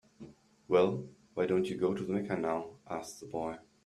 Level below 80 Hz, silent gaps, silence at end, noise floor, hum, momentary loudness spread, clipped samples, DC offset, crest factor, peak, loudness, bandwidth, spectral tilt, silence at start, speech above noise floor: -70 dBFS; none; 0.25 s; -54 dBFS; none; 15 LU; under 0.1%; under 0.1%; 20 dB; -14 dBFS; -34 LUFS; 13 kHz; -6.5 dB/octave; 0.2 s; 22 dB